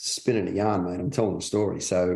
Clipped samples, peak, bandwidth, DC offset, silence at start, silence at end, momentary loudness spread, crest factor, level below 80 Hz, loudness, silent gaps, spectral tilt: under 0.1%; -10 dBFS; 12.5 kHz; under 0.1%; 0 s; 0 s; 2 LU; 16 dB; -58 dBFS; -26 LUFS; none; -5 dB/octave